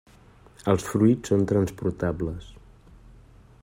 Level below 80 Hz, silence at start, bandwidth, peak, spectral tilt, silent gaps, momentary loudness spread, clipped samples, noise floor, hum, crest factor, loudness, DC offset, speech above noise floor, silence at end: -48 dBFS; 0.65 s; 16 kHz; -6 dBFS; -7.5 dB/octave; none; 12 LU; under 0.1%; -53 dBFS; none; 20 dB; -25 LUFS; under 0.1%; 29 dB; 0.7 s